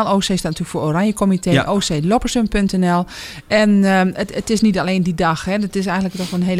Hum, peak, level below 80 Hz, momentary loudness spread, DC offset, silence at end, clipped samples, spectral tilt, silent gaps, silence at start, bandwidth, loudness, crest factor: none; 0 dBFS; -36 dBFS; 7 LU; under 0.1%; 0 s; under 0.1%; -5.5 dB/octave; none; 0 s; 15 kHz; -17 LUFS; 16 dB